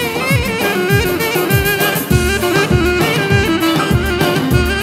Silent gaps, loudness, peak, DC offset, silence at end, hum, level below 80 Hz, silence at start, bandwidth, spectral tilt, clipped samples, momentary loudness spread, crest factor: none; -14 LUFS; 0 dBFS; under 0.1%; 0 s; none; -26 dBFS; 0 s; 16.5 kHz; -5 dB/octave; under 0.1%; 2 LU; 14 dB